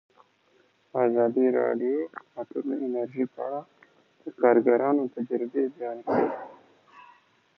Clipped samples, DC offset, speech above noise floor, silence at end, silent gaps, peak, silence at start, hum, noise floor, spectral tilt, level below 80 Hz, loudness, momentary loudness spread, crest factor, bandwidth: under 0.1%; under 0.1%; 39 dB; 0.55 s; none; -8 dBFS; 0.95 s; none; -65 dBFS; -9.5 dB/octave; -80 dBFS; -26 LUFS; 15 LU; 20 dB; 5.2 kHz